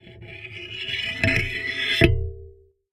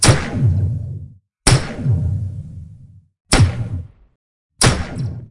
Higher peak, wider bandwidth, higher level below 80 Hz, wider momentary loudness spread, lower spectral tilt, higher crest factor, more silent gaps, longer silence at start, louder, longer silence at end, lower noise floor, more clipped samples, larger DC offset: about the same, -2 dBFS vs 0 dBFS; first, 14 kHz vs 11.5 kHz; about the same, -34 dBFS vs -30 dBFS; about the same, 19 LU vs 17 LU; about the same, -5 dB/octave vs -4 dB/octave; first, 24 dB vs 18 dB; second, none vs 3.20-3.25 s, 4.16-4.50 s; about the same, 0.05 s vs 0 s; second, -23 LUFS vs -18 LUFS; first, 0.4 s vs 0.05 s; first, -48 dBFS vs -43 dBFS; neither; neither